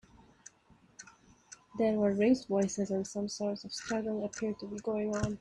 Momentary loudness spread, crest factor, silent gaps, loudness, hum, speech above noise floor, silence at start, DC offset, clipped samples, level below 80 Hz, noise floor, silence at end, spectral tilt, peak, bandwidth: 24 LU; 18 dB; none; -33 LUFS; none; 32 dB; 1 s; under 0.1%; under 0.1%; -62 dBFS; -64 dBFS; 0 s; -5.5 dB/octave; -16 dBFS; 11 kHz